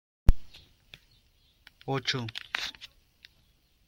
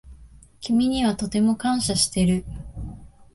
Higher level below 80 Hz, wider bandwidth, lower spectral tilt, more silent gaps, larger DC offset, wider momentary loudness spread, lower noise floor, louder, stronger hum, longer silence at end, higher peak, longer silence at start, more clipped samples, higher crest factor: first, -34 dBFS vs -42 dBFS; second, 9.8 kHz vs 12 kHz; about the same, -4.5 dB/octave vs -4.5 dB/octave; neither; neither; first, 23 LU vs 17 LU; first, -66 dBFS vs -48 dBFS; second, -33 LUFS vs -22 LUFS; neither; first, 1 s vs 0.3 s; first, -4 dBFS vs -8 dBFS; first, 0.3 s vs 0.05 s; neither; first, 26 dB vs 16 dB